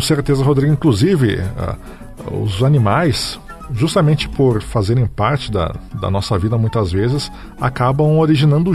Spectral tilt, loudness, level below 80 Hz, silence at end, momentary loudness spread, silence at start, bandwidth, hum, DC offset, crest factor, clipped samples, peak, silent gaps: -6.5 dB/octave; -16 LUFS; -34 dBFS; 0 s; 12 LU; 0 s; 13.5 kHz; none; under 0.1%; 14 dB; under 0.1%; -2 dBFS; none